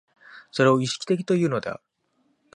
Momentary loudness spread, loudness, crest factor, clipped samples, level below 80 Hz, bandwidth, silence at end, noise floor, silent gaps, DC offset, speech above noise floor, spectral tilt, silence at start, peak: 14 LU; -23 LUFS; 20 dB; under 0.1%; -68 dBFS; 11 kHz; 0.8 s; -69 dBFS; none; under 0.1%; 47 dB; -5.5 dB/octave; 0.35 s; -6 dBFS